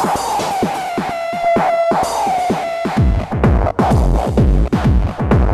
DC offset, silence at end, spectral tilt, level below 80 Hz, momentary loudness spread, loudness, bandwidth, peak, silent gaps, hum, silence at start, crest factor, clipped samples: under 0.1%; 0 s; -6.5 dB/octave; -20 dBFS; 5 LU; -16 LUFS; 14 kHz; -4 dBFS; none; none; 0 s; 12 dB; under 0.1%